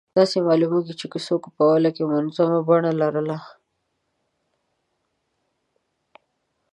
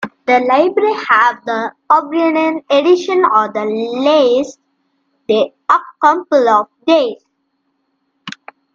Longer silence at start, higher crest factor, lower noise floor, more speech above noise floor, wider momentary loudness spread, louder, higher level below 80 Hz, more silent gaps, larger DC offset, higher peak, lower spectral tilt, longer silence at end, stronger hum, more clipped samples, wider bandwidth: first, 0.15 s vs 0 s; about the same, 18 dB vs 14 dB; first, -74 dBFS vs -67 dBFS; about the same, 54 dB vs 54 dB; about the same, 10 LU vs 10 LU; second, -21 LUFS vs -13 LUFS; second, -74 dBFS vs -66 dBFS; neither; neither; second, -4 dBFS vs 0 dBFS; first, -7 dB/octave vs -4.5 dB/octave; first, 3.25 s vs 0.45 s; neither; neither; first, 11 kHz vs 7.4 kHz